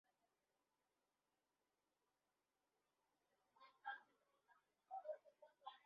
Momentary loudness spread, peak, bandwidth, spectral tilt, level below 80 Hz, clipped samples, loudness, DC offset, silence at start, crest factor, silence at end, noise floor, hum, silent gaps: 7 LU; -40 dBFS; 5 kHz; 3 dB/octave; under -90 dBFS; under 0.1%; -57 LUFS; under 0.1%; 3.55 s; 24 dB; 0.05 s; under -90 dBFS; none; none